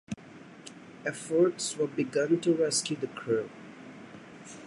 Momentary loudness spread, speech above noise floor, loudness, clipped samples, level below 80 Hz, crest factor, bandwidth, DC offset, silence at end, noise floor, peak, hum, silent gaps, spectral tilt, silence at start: 21 LU; 21 dB; -29 LUFS; under 0.1%; -72 dBFS; 18 dB; 11.5 kHz; under 0.1%; 0 s; -50 dBFS; -14 dBFS; none; none; -4 dB/octave; 0.1 s